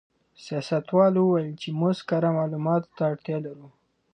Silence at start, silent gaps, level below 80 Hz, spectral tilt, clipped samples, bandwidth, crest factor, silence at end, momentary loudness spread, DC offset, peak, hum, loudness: 0.4 s; none; -72 dBFS; -8 dB/octave; under 0.1%; 9.4 kHz; 18 dB; 0.45 s; 12 LU; under 0.1%; -6 dBFS; none; -25 LUFS